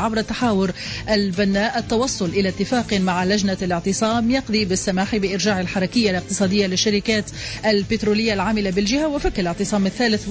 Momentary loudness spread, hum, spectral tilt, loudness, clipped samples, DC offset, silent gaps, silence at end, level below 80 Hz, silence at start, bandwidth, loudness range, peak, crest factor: 3 LU; none; -4.5 dB/octave; -20 LUFS; under 0.1%; under 0.1%; none; 0 s; -40 dBFS; 0 s; 8 kHz; 1 LU; -8 dBFS; 12 dB